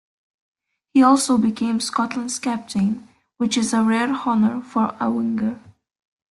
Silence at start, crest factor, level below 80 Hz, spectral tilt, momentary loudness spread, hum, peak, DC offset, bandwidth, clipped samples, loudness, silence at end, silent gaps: 0.95 s; 18 dB; -60 dBFS; -4.5 dB/octave; 9 LU; none; -4 dBFS; under 0.1%; 12.5 kHz; under 0.1%; -20 LUFS; 0.75 s; none